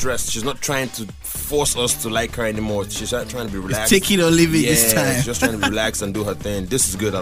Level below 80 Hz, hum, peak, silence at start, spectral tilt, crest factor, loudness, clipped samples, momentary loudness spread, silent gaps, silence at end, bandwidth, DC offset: -36 dBFS; none; -2 dBFS; 0 s; -3.5 dB/octave; 18 dB; -19 LUFS; under 0.1%; 10 LU; none; 0 s; 16 kHz; under 0.1%